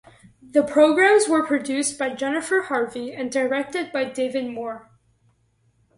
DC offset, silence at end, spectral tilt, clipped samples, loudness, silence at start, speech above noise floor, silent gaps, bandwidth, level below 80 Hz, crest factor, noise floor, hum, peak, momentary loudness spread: under 0.1%; 1.15 s; -3 dB/octave; under 0.1%; -21 LUFS; 0.55 s; 43 dB; none; 11.5 kHz; -66 dBFS; 18 dB; -64 dBFS; none; -4 dBFS; 13 LU